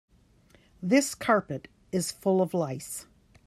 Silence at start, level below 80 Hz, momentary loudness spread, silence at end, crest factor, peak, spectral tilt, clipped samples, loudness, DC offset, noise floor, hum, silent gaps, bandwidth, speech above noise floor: 0.8 s; -64 dBFS; 14 LU; 0.45 s; 20 dB; -10 dBFS; -5 dB/octave; under 0.1%; -28 LUFS; under 0.1%; -60 dBFS; none; none; 14.5 kHz; 33 dB